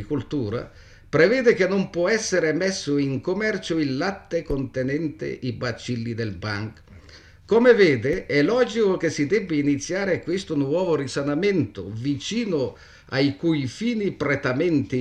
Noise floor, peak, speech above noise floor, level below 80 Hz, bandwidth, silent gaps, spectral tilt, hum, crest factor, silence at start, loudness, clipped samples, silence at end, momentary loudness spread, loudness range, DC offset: -47 dBFS; -4 dBFS; 25 dB; -48 dBFS; 9.8 kHz; none; -5.5 dB/octave; none; 18 dB; 0 s; -23 LUFS; under 0.1%; 0 s; 10 LU; 6 LU; under 0.1%